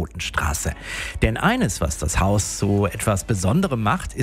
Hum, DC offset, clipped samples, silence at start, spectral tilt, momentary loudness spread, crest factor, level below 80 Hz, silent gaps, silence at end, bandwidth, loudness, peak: none; under 0.1%; under 0.1%; 0 s; -5 dB/octave; 6 LU; 18 dB; -32 dBFS; none; 0 s; 16 kHz; -22 LUFS; -4 dBFS